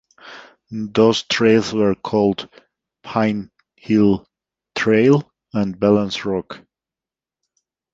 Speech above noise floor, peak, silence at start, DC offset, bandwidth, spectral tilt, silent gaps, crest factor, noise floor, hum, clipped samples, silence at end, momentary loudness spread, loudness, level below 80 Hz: 72 dB; -2 dBFS; 0.25 s; under 0.1%; 7.8 kHz; -6 dB/octave; none; 18 dB; -89 dBFS; none; under 0.1%; 1.35 s; 19 LU; -18 LUFS; -52 dBFS